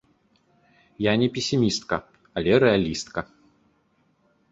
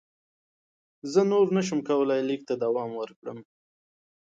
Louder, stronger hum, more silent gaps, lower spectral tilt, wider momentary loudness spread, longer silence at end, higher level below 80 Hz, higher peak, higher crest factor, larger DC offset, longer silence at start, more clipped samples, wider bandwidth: first, -23 LUFS vs -26 LUFS; neither; second, none vs 3.16-3.22 s; about the same, -5 dB/octave vs -6 dB/octave; second, 14 LU vs 18 LU; first, 1.3 s vs 0.8 s; first, -52 dBFS vs -76 dBFS; first, -6 dBFS vs -10 dBFS; about the same, 20 dB vs 18 dB; neither; about the same, 1 s vs 1.05 s; neither; about the same, 8 kHz vs 7.8 kHz